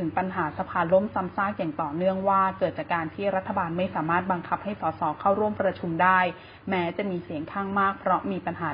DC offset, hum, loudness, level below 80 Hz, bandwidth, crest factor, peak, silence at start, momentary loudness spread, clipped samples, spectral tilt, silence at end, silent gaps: under 0.1%; none; -26 LUFS; -56 dBFS; 5.2 kHz; 18 dB; -8 dBFS; 0 s; 7 LU; under 0.1%; -11 dB/octave; 0 s; none